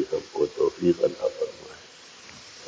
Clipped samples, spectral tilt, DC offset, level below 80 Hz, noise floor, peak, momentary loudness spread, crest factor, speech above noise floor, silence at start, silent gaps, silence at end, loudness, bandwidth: under 0.1%; -6 dB/octave; under 0.1%; -60 dBFS; -48 dBFS; -10 dBFS; 21 LU; 18 dB; 22 dB; 0 s; none; 0 s; -26 LUFS; 8 kHz